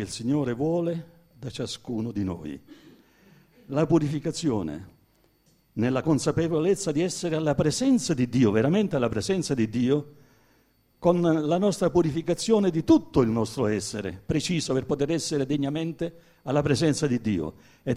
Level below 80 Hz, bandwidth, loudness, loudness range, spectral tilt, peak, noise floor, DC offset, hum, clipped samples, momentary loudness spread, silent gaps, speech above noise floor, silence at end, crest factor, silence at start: -54 dBFS; 14.5 kHz; -25 LUFS; 6 LU; -6 dB/octave; -8 dBFS; -64 dBFS; under 0.1%; none; under 0.1%; 12 LU; none; 39 dB; 0 s; 18 dB; 0 s